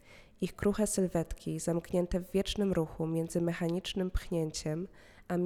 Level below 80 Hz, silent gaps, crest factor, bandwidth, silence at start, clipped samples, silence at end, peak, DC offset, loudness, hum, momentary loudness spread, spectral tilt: -48 dBFS; none; 16 dB; 17 kHz; 0.1 s; under 0.1%; 0 s; -18 dBFS; under 0.1%; -34 LUFS; none; 7 LU; -5.5 dB/octave